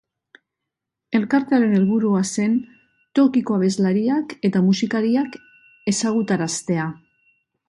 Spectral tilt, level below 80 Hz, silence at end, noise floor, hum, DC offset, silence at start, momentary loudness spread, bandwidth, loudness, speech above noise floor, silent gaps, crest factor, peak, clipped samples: -5.5 dB/octave; -64 dBFS; 0.75 s; -83 dBFS; none; under 0.1%; 1.1 s; 7 LU; 11.5 kHz; -20 LUFS; 64 dB; none; 14 dB; -6 dBFS; under 0.1%